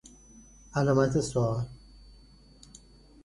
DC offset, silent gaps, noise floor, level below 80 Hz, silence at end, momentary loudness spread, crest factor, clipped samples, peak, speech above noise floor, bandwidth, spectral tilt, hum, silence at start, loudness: under 0.1%; none; -55 dBFS; -52 dBFS; 1.5 s; 11 LU; 20 dB; under 0.1%; -10 dBFS; 29 dB; 11.5 kHz; -6.5 dB/octave; none; 0.35 s; -28 LUFS